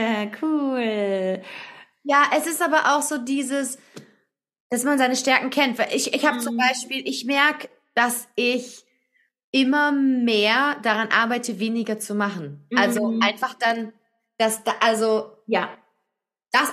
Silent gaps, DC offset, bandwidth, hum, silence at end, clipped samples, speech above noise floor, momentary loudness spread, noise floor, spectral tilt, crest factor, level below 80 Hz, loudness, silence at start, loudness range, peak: 4.60-4.70 s, 9.44-9.53 s; under 0.1%; 14.5 kHz; none; 0 s; under 0.1%; 59 dB; 9 LU; -81 dBFS; -3 dB/octave; 20 dB; -80 dBFS; -22 LUFS; 0 s; 2 LU; -2 dBFS